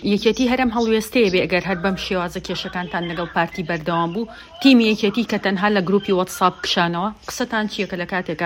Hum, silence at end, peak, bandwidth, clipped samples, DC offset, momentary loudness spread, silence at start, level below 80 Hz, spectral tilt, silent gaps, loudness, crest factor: none; 0 s; 0 dBFS; 16.5 kHz; under 0.1%; under 0.1%; 8 LU; 0 s; -48 dBFS; -5 dB/octave; none; -20 LUFS; 18 dB